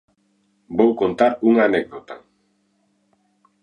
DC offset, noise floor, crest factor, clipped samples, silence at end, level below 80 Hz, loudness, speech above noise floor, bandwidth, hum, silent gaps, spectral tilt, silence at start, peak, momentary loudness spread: under 0.1%; -65 dBFS; 20 dB; under 0.1%; 1.45 s; -60 dBFS; -18 LUFS; 48 dB; 9.2 kHz; none; none; -7.5 dB/octave; 0.7 s; -2 dBFS; 22 LU